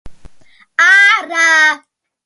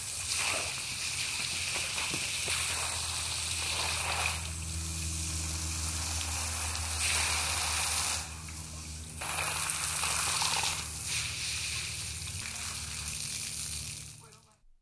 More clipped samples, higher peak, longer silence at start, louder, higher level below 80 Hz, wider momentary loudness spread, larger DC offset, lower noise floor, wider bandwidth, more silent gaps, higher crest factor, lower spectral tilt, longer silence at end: neither; first, 0 dBFS vs -14 dBFS; about the same, 0.05 s vs 0 s; first, -9 LUFS vs -31 LUFS; about the same, -48 dBFS vs -48 dBFS; first, 12 LU vs 8 LU; neither; second, -45 dBFS vs -59 dBFS; about the same, 11.5 kHz vs 11 kHz; neither; second, 14 dB vs 20 dB; second, 0.5 dB/octave vs -1 dB/octave; about the same, 0.5 s vs 0.45 s